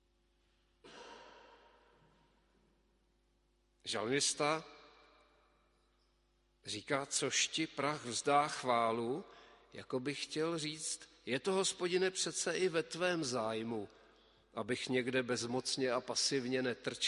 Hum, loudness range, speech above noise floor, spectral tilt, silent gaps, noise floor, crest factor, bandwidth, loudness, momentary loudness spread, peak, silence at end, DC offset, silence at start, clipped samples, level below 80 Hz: 50 Hz at -75 dBFS; 4 LU; 39 dB; -2.5 dB/octave; none; -75 dBFS; 22 dB; 11.5 kHz; -36 LUFS; 16 LU; -18 dBFS; 0 s; under 0.1%; 0.85 s; under 0.1%; -76 dBFS